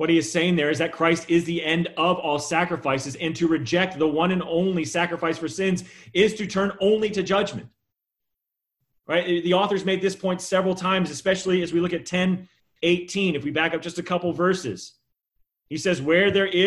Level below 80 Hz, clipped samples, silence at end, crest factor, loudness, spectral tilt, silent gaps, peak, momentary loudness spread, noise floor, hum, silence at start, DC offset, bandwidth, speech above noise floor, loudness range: -58 dBFS; under 0.1%; 0 s; 18 dB; -23 LUFS; -5 dB/octave; none; -6 dBFS; 6 LU; -83 dBFS; none; 0 s; under 0.1%; 12 kHz; 60 dB; 3 LU